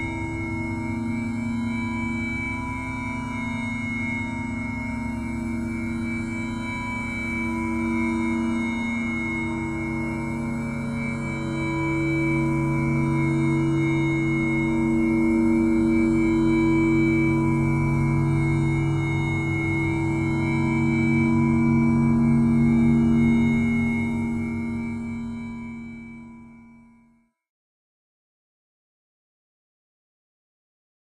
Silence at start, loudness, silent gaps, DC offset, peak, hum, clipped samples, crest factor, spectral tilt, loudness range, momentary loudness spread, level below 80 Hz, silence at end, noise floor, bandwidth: 0 s; -24 LUFS; none; under 0.1%; -10 dBFS; none; under 0.1%; 14 dB; -8 dB/octave; 8 LU; 9 LU; -40 dBFS; 4.35 s; -61 dBFS; 11 kHz